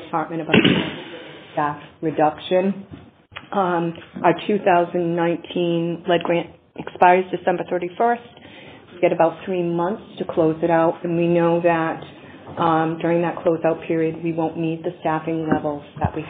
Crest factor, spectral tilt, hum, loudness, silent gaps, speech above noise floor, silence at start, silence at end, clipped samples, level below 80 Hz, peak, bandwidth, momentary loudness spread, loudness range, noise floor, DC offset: 20 dB; -4.5 dB/octave; none; -21 LUFS; none; 22 dB; 0 s; 0 s; under 0.1%; -54 dBFS; 0 dBFS; 4 kHz; 14 LU; 3 LU; -42 dBFS; under 0.1%